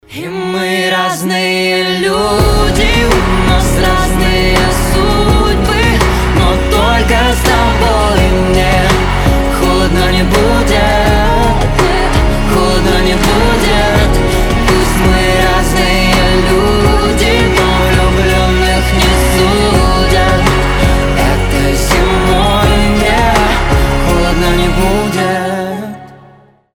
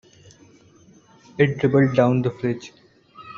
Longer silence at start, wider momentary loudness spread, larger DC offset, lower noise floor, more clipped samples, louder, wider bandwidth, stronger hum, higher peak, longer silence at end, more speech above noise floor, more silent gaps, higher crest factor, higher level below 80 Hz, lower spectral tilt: second, 0.1 s vs 1.4 s; second, 3 LU vs 18 LU; neither; second, -42 dBFS vs -52 dBFS; neither; first, -10 LUFS vs -20 LUFS; first, 18.5 kHz vs 7.2 kHz; neither; first, 0 dBFS vs -4 dBFS; first, 0.6 s vs 0 s; second, 29 dB vs 33 dB; neither; second, 10 dB vs 20 dB; first, -14 dBFS vs -58 dBFS; second, -5 dB/octave vs -7 dB/octave